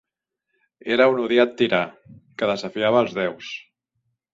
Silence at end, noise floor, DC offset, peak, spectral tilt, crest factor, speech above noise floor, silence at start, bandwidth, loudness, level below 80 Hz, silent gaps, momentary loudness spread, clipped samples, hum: 0.75 s; -81 dBFS; under 0.1%; -4 dBFS; -5.5 dB/octave; 20 dB; 60 dB; 0.85 s; 7.6 kHz; -21 LUFS; -66 dBFS; none; 17 LU; under 0.1%; none